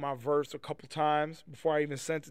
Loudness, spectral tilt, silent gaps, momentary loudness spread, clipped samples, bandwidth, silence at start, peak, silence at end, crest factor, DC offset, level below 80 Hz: -33 LUFS; -5 dB/octave; none; 10 LU; under 0.1%; 15.5 kHz; 0 s; -16 dBFS; 0 s; 16 dB; 0.1%; -72 dBFS